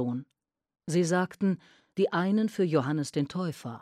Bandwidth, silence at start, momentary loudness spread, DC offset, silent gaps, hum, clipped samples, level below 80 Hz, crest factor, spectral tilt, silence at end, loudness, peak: 13.5 kHz; 0 s; 11 LU; under 0.1%; none; none; under 0.1%; -74 dBFS; 16 dB; -6.5 dB/octave; 0.05 s; -29 LUFS; -12 dBFS